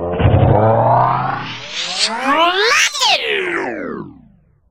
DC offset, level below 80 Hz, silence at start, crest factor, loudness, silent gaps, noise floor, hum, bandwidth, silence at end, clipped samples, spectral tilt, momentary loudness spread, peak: under 0.1%; -34 dBFS; 0 s; 16 dB; -14 LUFS; none; -49 dBFS; none; 16 kHz; 0.6 s; under 0.1%; -4 dB/octave; 12 LU; 0 dBFS